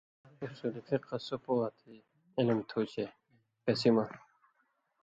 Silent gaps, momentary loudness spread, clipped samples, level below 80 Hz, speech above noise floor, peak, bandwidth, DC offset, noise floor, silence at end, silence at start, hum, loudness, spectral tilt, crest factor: none; 13 LU; under 0.1%; -74 dBFS; 43 dB; -14 dBFS; 7.8 kHz; under 0.1%; -77 dBFS; 0.85 s; 0.4 s; none; -34 LUFS; -7 dB/octave; 22 dB